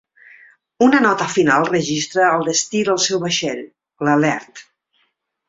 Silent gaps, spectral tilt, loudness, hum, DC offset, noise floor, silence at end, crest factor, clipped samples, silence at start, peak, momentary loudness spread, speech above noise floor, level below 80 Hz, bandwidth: none; -3.5 dB/octave; -17 LUFS; none; under 0.1%; -67 dBFS; 0.9 s; 18 dB; under 0.1%; 0.8 s; -2 dBFS; 7 LU; 50 dB; -60 dBFS; 7.8 kHz